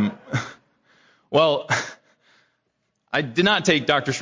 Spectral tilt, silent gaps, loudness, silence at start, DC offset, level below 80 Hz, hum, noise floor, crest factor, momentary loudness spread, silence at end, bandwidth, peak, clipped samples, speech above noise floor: -4.5 dB/octave; none; -21 LUFS; 0 s; under 0.1%; -60 dBFS; none; -73 dBFS; 20 dB; 10 LU; 0 s; 7.8 kHz; -4 dBFS; under 0.1%; 53 dB